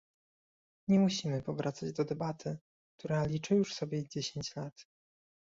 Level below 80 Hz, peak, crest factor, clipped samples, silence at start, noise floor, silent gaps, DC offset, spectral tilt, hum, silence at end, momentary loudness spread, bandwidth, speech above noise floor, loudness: -68 dBFS; -18 dBFS; 18 dB; under 0.1%; 0.9 s; under -90 dBFS; 2.61-2.98 s, 4.72-4.76 s; under 0.1%; -6 dB/octave; none; 0.75 s; 15 LU; 7.8 kHz; over 57 dB; -34 LUFS